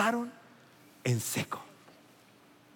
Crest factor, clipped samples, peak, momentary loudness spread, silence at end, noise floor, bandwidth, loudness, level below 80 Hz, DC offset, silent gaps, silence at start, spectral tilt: 22 dB; under 0.1%; -14 dBFS; 24 LU; 1.05 s; -60 dBFS; 17 kHz; -34 LUFS; -84 dBFS; under 0.1%; none; 0 s; -4.5 dB/octave